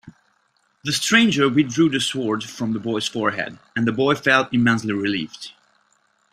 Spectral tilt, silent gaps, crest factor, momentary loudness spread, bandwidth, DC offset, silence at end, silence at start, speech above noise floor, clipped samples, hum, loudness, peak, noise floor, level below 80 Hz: -4 dB/octave; none; 20 dB; 12 LU; 15 kHz; under 0.1%; 0.8 s; 0.05 s; 45 dB; under 0.1%; none; -20 LUFS; -2 dBFS; -65 dBFS; -60 dBFS